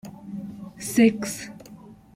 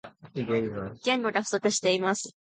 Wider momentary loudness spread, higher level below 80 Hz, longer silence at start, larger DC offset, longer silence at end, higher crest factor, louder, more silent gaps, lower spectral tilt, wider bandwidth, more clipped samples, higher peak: first, 22 LU vs 9 LU; about the same, -60 dBFS vs -64 dBFS; about the same, 0.05 s vs 0.05 s; neither; about the same, 0.2 s vs 0.2 s; about the same, 20 dB vs 18 dB; first, -23 LUFS vs -28 LUFS; neither; first, -5 dB/octave vs -3.5 dB/octave; first, 16 kHz vs 9.6 kHz; neither; first, -6 dBFS vs -12 dBFS